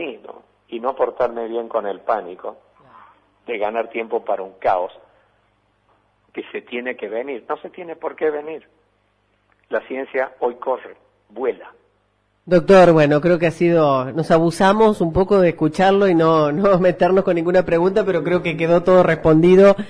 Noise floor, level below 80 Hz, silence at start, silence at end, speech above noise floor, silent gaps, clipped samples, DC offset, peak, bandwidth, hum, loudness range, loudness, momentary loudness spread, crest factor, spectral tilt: -64 dBFS; -48 dBFS; 0 s; 0 s; 47 dB; none; under 0.1%; under 0.1%; -2 dBFS; 11 kHz; 50 Hz at -60 dBFS; 13 LU; -17 LUFS; 16 LU; 16 dB; -7.5 dB/octave